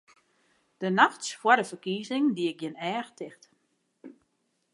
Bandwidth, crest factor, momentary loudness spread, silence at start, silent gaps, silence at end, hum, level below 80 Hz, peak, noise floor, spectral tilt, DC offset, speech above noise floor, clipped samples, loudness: 11.5 kHz; 24 dB; 14 LU; 0.8 s; none; 0.6 s; none; -86 dBFS; -6 dBFS; -75 dBFS; -4 dB/octave; under 0.1%; 48 dB; under 0.1%; -27 LUFS